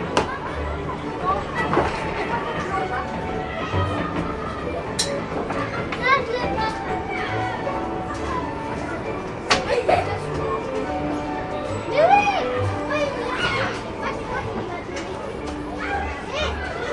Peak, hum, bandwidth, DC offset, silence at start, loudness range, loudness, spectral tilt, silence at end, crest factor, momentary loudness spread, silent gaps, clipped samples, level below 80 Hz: -2 dBFS; none; 11.5 kHz; under 0.1%; 0 s; 4 LU; -24 LUFS; -5 dB/octave; 0 s; 22 dB; 9 LU; none; under 0.1%; -40 dBFS